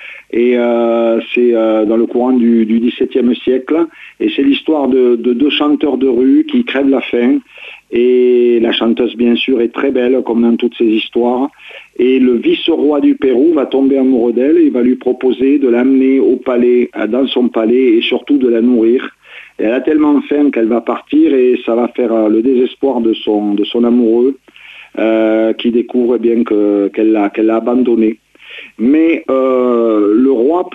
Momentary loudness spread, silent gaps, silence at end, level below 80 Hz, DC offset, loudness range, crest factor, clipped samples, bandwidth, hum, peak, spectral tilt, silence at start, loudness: 5 LU; none; 0 s; -54 dBFS; under 0.1%; 2 LU; 10 dB; under 0.1%; 4.1 kHz; none; -2 dBFS; -7.5 dB/octave; 0 s; -12 LUFS